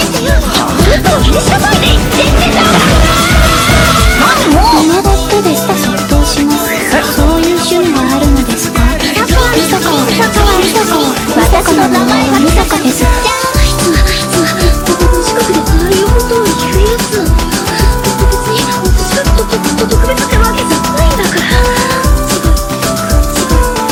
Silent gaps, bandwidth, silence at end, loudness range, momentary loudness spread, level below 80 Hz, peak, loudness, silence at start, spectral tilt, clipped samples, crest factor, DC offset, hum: none; 19 kHz; 0 s; 3 LU; 4 LU; -14 dBFS; 0 dBFS; -9 LUFS; 0 s; -4 dB/octave; 0.5%; 8 dB; under 0.1%; none